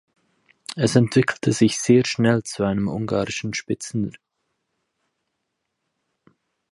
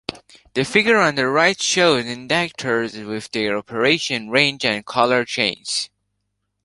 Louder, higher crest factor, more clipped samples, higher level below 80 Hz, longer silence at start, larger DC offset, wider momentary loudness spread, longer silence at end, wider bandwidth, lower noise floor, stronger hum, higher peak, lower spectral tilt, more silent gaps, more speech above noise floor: second, -21 LUFS vs -18 LUFS; about the same, 20 dB vs 20 dB; neither; about the same, -54 dBFS vs -58 dBFS; first, 0.7 s vs 0.1 s; neither; about the same, 10 LU vs 9 LU; first, 2.6 s vs 0.8 s; about the same, 11.5 kHz vs 11.5 kHz; first, -78 dBFS vs -74 dBFS; second, none vs 50 Hz at -60 dBFS; about the same, -4 dBFS vs -2 dBFS; first, -5.5 dB/octave vs -3 dB/octave; neither; about the same, 57 dB vs 55 dB